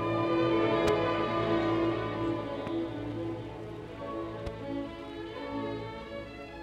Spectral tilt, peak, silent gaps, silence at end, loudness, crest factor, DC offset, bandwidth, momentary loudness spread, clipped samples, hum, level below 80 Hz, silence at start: -7 dB/octave; -14 dBFS; none; 0 s; -32 LUFS; 18 dB; under 0.1%; 9.8 kHz; 14 LU; under 0.1%; none; -52 dBFS; 0 s